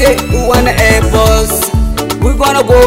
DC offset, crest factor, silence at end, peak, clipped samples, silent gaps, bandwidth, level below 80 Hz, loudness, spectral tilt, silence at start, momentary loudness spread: under 0.1%; 8 dB; 0 s; 0 dBFS; 2%; none; 16.5 kHz; -14 dBFS; -10 LUFS; -4.5 dB/octave; 0 s; 5 LU